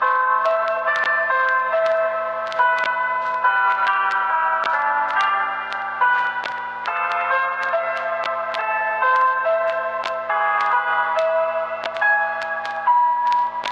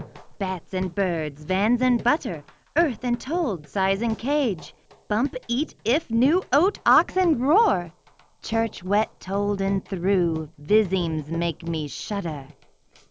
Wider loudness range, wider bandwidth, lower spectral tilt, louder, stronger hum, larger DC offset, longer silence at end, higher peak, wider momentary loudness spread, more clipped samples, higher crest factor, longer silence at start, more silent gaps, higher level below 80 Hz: about the same, 2 LU vs 4 LU; about the same, 8.6 kHz vs 8 kHz; second, -2 dB/octave vs -6 dB/octave; first, -20 LUFS vs -24 LUFS; first, 60 Hz at -55 dBFS vs none; neither; second, 0 s vs 0.6 s; about the same, -6 dBFS vs -6 dBFS; second, 6 LU vs 10 LU; neither; about the same, 14 dB vs 18 dB; about the same, 0 s vs 0 s; neither; second, -66 dBFS vs -50 dBFS